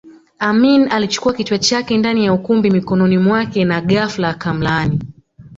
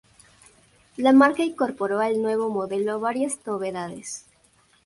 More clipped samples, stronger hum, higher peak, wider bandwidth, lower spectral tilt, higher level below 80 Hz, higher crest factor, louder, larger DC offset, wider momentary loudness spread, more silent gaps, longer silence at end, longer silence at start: neither; neither; about the same, -2 dBFS vs -4 dBFS; second, 7.8 kHz vs 11.5 kHz; about the same, -5.5 dB/octave vs -4.5 dB/octave; first, -46 dBFS vs -66 dBFS; second, 14 dB vs 20 dB; first, -15 LUFS vs -23 LUFS; neither; second, 7 LU vs 17 LU; neither; second, 0 s vs 0.65 s; second, 0.05 s vs 1 s